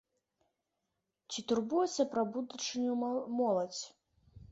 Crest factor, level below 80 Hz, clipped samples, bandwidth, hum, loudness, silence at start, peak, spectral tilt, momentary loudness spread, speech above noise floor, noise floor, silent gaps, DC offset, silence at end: 18 dB; -72 dBFS; under 0.1%; 8 kHz; none; -35 LUFS; 1.3 s; -18 dBFS; -4 dB/octave; 10 LU; 52 dB; -86 dBFS; none; under 0.1%; 0.1 s